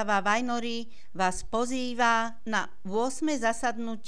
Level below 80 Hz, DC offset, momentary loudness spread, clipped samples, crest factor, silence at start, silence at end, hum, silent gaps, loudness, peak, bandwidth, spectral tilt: -52 dBFS; 2%; 7 LU; under 0.1%; 18 dB; 0 s; 0.1 s; none; none; -29 LUFS; -12 dBFS; 11 kHz; -3.5 dB/octave